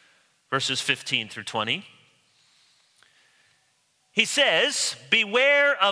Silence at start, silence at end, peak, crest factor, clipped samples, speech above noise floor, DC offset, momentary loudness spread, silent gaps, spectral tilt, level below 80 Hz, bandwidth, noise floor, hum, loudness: 0.5 s; 0 s; -2 dBFS; 24 dB; under 0.1%; 44 dB; under 0.1%; 10 LU; none; -1.5 dB/octave; -78 dBFS; 11 kHz; -68 dBFS; none; -22 LUFS